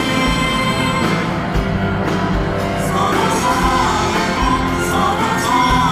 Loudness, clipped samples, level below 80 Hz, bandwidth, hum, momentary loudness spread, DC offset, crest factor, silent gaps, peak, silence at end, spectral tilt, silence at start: -16 LUFS; under 0.1%; -28 dBFS; 16 kHz; none; 4 LU; under 0.1%; 12 dB; none; -4 dBFS; 0 s; -5 dB/octave; 0 s